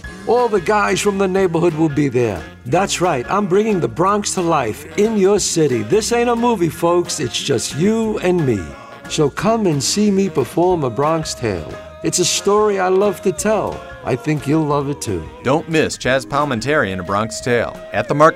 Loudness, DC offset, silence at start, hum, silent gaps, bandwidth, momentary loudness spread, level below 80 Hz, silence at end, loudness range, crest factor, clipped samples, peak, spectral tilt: -17 LUFS; under 0.1%; 0.05 s; none; none; 16 kHz; 7 LU; -44 dBFS; 0 s; 2 LU; 16 dB; under 0.1%; 0 dBFS; -4.5 dB/octave